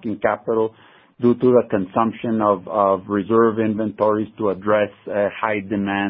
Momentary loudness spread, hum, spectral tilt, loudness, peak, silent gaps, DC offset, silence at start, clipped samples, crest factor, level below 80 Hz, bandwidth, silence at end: 6 LU; none; -12 dB/octave; -20 LUFS; -2 dBFS; none; under 0.1%; 0.05 s; under 0.1%; 18 dB; -54 dBFS; 3.9 kHz; 0 s